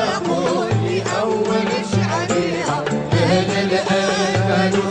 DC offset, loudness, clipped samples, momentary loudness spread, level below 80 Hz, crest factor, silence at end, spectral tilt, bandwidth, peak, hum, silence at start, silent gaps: under 0.1%; -18 LUFS; under 0.1%; 3 LU; -50 dBFS; 12 dB; 0 s; -5.5 dB/octave; 9.8 kHz; -6 dBFS; none; 0 s; none